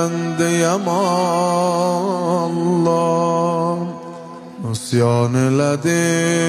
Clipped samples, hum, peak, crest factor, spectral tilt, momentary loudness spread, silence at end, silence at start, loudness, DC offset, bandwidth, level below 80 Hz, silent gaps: under 0.1%; none; -4 dBFS; 14 dB; -5.5 dB/octave; 10 LU; 0 s; 0 s; -18 LUFS; under 0.1%; 13.5 kHz; -62 dBFS; none